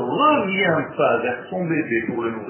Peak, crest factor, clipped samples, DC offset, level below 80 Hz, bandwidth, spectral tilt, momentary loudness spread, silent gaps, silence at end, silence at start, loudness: -6 dBFS; 16 dB; under 0.1%; under 0.1%; -60 dBFS; 3.2 kHz; -9.5 dB/octave; 8 LU; none; 0 s; 0 s; -20 LUFS